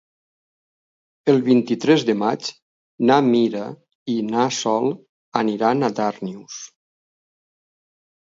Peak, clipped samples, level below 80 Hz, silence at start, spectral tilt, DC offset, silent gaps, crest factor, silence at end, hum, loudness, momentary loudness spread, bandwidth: -2 dBFS; under 0.1%; -70 dBFS; 1.25 s; -5.5 dB/octave; under 0.1%; 2.62-2.98 s, 3.95-4.06 s, 5.09-5.32 s; 20 dB; 1.7 s; none; -20 LUFS; 18 LU; 7.8 kHz